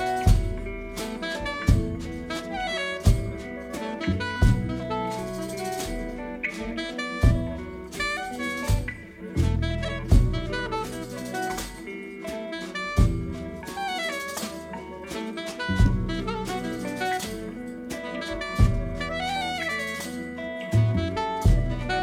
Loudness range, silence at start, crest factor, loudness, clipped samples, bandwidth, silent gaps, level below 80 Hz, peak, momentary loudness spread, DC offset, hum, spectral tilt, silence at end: 3 LU; 0 s; 20 dB; -28 LUFS; under 0.1%; 16 kHz; none; -32 dBFS; -6 dBFS; 11 LU; under 0.1%; none; -5.5 dB/octave; 0 s